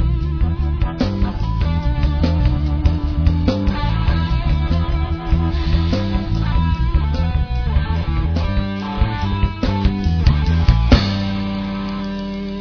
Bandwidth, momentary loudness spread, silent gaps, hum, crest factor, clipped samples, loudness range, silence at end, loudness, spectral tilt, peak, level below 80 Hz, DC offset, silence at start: 5.4 kHz; 6 LU; none; none; 16 dB; under 0.1%; 2 LU; 0 s; -19 LUFS; -8 dB/octave; 0 dBFS; -20 dBFS; under 0.1%; 0 s